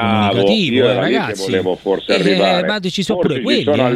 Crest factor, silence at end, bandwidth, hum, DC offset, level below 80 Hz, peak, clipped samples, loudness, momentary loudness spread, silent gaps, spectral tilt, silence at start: 14 dB; 0 s; 14 kHz; none; under 0.1%; -50 dBFS; 0 dBFS; under 0.1%; -15 LUFS; 5 LU; none; -5.5 dB/octave; 0 s